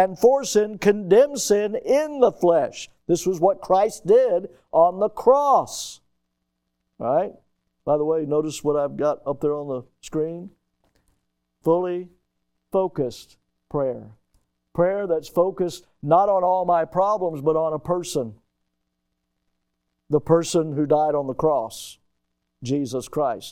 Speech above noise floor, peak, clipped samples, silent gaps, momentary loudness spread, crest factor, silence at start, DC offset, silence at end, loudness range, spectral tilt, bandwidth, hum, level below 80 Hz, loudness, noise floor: 55 dB; -4 dBFS; under 0.1%; none; 13 LU; 18 dB; 0 s; under 0.1%; 0 s; 8 LU; -5.5 dB/octave; 16.5 kHz; none; -56 dBFS; -22 LUFS; -76 dBFS